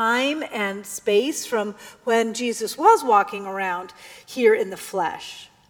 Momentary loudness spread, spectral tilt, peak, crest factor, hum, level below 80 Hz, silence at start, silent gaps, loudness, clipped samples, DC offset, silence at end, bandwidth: 15 LU; -3 dB/octave; -4 dBFS; 18 dB; none; -70 dBFS; 0 s; none; -22 LUFS; under 0.1%; under 0.1%; 0.25 s; 19.5 kHz